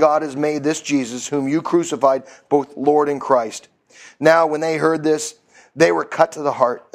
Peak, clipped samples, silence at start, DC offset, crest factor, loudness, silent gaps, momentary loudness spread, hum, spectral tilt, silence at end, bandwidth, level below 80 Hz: 0 dBFS; under 0.1%; 0 s; under 0.1%; 18 dB; -18 LUFS; none; 7 LU; none; -4.5 dB/octave; 0.15 s; 14.5 kHz; -64 dBFS